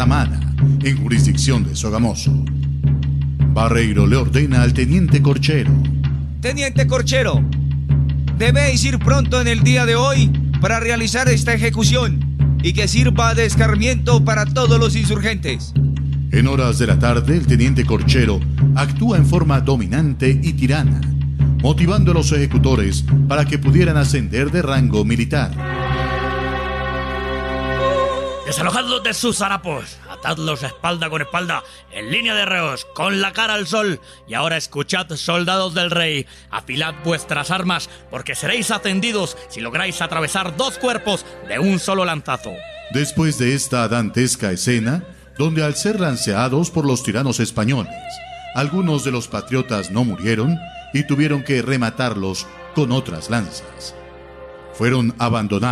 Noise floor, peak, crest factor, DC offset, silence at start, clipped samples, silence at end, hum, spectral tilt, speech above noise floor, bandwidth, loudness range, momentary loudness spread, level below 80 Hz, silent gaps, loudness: -37 dBFS; 0 dBFS; 16 dB; under 0.1%; 0 s; under 0.1%; 0 s; none; -5.5 dB/octave; 21 dB; 13.5 kHz; 5 LU; 9 LU; -26 dBFS; none; -17 LUFS